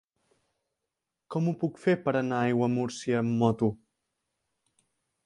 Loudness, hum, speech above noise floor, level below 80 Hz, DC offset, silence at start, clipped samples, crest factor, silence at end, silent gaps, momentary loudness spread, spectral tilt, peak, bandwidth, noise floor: -28 LUFS; none; 59 dB; -68 dBFS; under 0.1%; 1.3 s; under 0.1%; 20 dB; 1.5 s; none; 5 LU; -7 dB/octave; -10 dBFS; 11 kHz; -86 dBFS